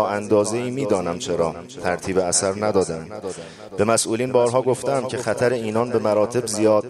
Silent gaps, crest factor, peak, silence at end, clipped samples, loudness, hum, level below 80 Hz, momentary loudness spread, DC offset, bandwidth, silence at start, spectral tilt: none; 18 dB; -4 dBFS; 0 s; under 0.1%; -21 LUFS; none; -56 dBFS; 9 LU; under 0.1%; 13.5 kHz; 0 s; -4.5 dB/octave